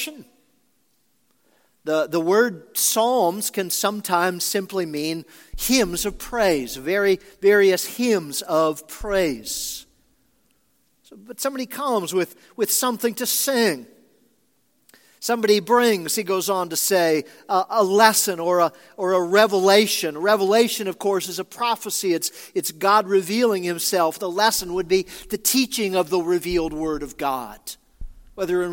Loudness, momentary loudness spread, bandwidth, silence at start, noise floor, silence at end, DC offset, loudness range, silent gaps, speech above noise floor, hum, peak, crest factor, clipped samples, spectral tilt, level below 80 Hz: -21 LUFS; 10 LU; 17 kHz; 0 s; -67 dBFS; 0 s; under 0.1%; 6 LU; none; 46 dB; none; 0 dBFS; 22 dB; under 0.1%; -3 dB/octave; -48 dBFS